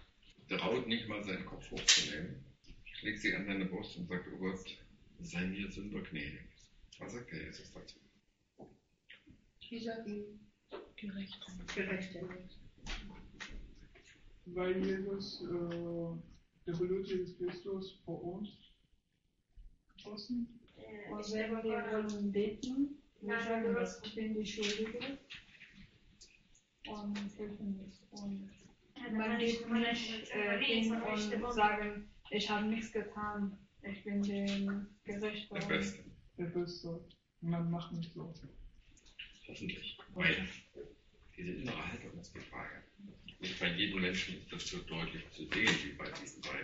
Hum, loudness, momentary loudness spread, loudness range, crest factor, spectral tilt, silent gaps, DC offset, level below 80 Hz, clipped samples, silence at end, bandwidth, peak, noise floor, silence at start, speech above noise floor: none; -39 LUFS; 19 LU; 11 LU; 30 dB; -3 dB/octave; none; under 0.1%; -60 dBFS; under 0.1%; 0 s; 7.6 kHz; -10 dBFS; -79 dBFS; 0 s; 40 dB